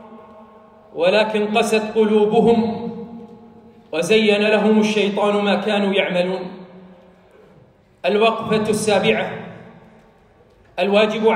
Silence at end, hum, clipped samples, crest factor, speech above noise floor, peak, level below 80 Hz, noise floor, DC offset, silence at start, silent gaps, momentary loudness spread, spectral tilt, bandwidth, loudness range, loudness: 0 s; none; under 0.1%; 16 dB; 35 dB; -4 dBFS; -60 dBFS; -52 dBFS; under 0.1%; 0 s; none; 18 LU; -5 dB/octave; 15 kHz; 4 LU; -18 LUFS